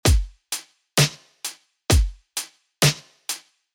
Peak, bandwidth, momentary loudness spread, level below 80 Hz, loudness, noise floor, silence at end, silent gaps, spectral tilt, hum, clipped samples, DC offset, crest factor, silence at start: -2 dBFS; 18.5 kHz; 13 LU; -28 dBFS; -24 LUFS; -38 dBFS; 0.35 s; none; -3.5 dB/octave; none; under 0.1%; under 0.1%; 22 dB; 0.05 s